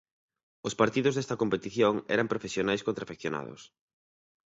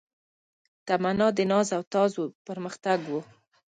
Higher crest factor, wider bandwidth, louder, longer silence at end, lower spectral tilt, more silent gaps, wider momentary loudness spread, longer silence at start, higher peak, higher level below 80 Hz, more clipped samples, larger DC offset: first, 24 dB vs 18 dB; second, 8 kHz vs 9.4 kHz; second, -30 LUFS vs -27 LUFS; first, 0.95 s vs 0.45 s; about the same, -5 dB/octave vs -5.5 dB/octave; second, none vs 1.87-1.91 s, 2.35-2.45 s; about the same, 11 LU vs 12 LU; second, 0.65 s vs 0.85 s; about the same, -8 dBFS vs -10 dBFS; about the same, -64 dBFS vs -68 dBFS; neither; neither